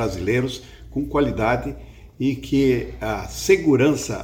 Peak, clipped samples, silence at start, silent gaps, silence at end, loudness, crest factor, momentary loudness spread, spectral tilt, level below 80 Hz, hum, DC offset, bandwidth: -2 dBFS; under 0.1%; 0 s; none; 0 s; -21 LUFS; 18 dB; 12 LU; -5.5 dB/octave; -38 dBFS; none; under 0.1%; 17.5 kHz